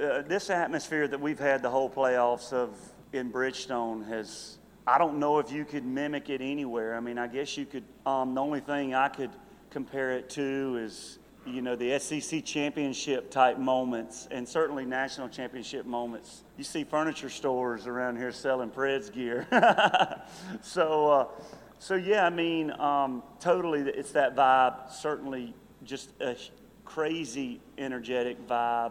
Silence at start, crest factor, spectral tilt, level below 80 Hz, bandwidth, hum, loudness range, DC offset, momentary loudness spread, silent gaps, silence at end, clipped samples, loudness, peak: 0 s; 22 dB; -4 dB/octave; -66 dBFS; 16 kHz; none; 7 LU; under 0.1%; 15 LU; none; 0 s; under 0.1%; -30 LUFS; -8 dBFS